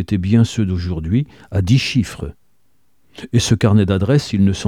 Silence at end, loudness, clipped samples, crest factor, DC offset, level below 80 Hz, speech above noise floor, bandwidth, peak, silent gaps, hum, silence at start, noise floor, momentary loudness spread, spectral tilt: 0 s; -17 LUFS; under 0.1%; 16 dB; 0.2%; -38 dBFS; 49 dB; 12.5 kHz; 0 dBFS; none; none; 0 s; -65 dBFS; 10 LU; -6.5 dB/octave